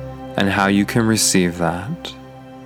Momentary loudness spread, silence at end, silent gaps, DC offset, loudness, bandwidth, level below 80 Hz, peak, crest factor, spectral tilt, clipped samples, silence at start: 15 LU; 0 s; none; under 0.1%; -17 LUFS; 18.5 kHz; -46 dBFS; -2 dBFS; 18 dB; -4 dB/octave; under 0.1%; 0 s